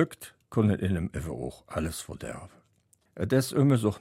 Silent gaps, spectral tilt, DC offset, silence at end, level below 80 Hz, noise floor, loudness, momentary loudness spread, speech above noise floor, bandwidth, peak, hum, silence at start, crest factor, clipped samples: none; -6.5 dB/octave; under 0.1%; 0 s; -50 dBFS; -68 dBFS; -29 LUFS; 16 LU; 40 dB; 16 kHz; -10 dBFS; none; 0 s; 20 dB; under 0.1%